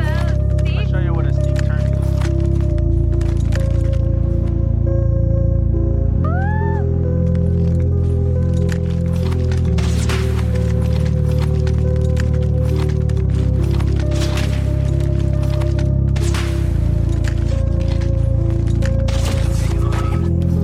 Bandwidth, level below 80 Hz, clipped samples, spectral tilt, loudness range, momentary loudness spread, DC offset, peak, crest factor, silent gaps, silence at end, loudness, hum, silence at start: 12 kHz; -20 dBFS; under 0.1%; -7.5 dB/octave; 1 LU; 1 LU; under 0.1%; -6 dBFS; 8 dB; none; 0 s; -18 LUFS; none; 0 s